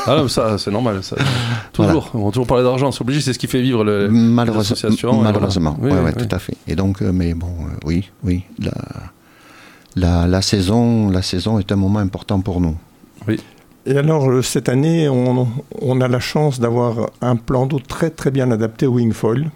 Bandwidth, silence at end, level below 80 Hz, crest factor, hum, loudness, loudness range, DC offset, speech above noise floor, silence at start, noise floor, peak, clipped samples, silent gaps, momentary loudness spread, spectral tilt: 16.5 kHz; 0.05 s; -36 dBFS; 16 dB; none; -17 LUFS; 5 LU; under 0.1%; 28 dB; 0 s; -44 dBFS; 0 dBFS; under 0.1%; none; 8 LU; -6.5 dB/octave